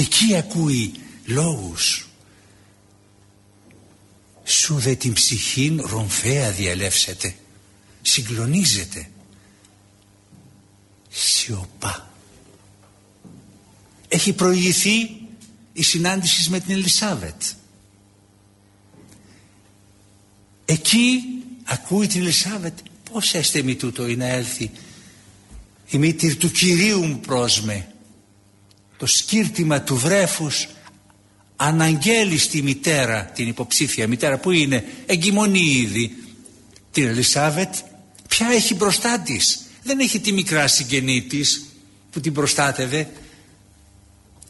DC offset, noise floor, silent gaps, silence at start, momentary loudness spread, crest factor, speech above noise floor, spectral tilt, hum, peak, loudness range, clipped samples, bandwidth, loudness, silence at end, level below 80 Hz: under 0.1%; -54 dBFS; none; 0 s; 12 LU; 18 dB; 34 dB; -3 dB/octave; none; -4 dBFS; 7 LU; under 0.1%; 12 kHz; -19 LUFS; 1.2 s; -52 dBFS